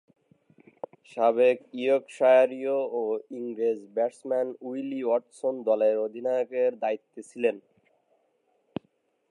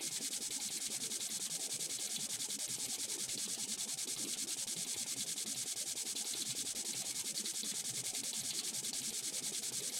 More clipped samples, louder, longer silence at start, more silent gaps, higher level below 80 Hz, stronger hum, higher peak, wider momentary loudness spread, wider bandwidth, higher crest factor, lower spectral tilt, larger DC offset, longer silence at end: neither; first, -27 LUFS vs -38 LUFS; first, 1.15 s vs 0 s; neither; about the same, -82 dBFS vs -84 dBFS; neither; first, -10 dBFS vs -24 dBFS; first, 19 LU vs 1 LU; second, 10.5 kHz vs 16.5 kHz; about the same, 18 dB vs 16 dB; first, -5.5 dB/octave vs 0.5 dB/octave; neither; first, 1.7 s vs 0 s